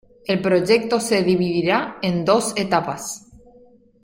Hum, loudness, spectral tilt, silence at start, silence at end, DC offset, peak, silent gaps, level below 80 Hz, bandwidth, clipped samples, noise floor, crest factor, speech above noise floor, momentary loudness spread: none; -20 LUFS; -5 dB/octave; 0.3 s; 0.85 s; under 0.1%; -2 dBFS; none; -56 dBFS; 16.5 kHz; under 0.1%; -51 dBFS; 18 dB; 32 dB; 10 LU